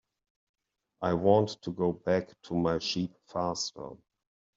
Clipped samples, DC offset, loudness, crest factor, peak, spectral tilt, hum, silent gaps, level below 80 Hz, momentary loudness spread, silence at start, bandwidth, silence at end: under 0.1%; under 0.1%; -30 LUFS; 22 dB; -10 dBFS; -5.5 dB/octave; none; none; -64 dBFS; 11 LU; 1 s; 7.8 kHz; 0.6 s